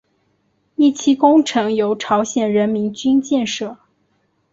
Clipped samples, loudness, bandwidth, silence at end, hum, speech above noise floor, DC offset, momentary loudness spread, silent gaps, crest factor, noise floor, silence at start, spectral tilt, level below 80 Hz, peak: under 0.1%; -17 LUFS; 7.8 kHz; 0.8 s; none; 48 dB; under 0.1%; 10 LU; none; 16 dB; -64 dBFS; 0.8 s; -4.5 dB/octave; -62 dBFS; -2 dBFS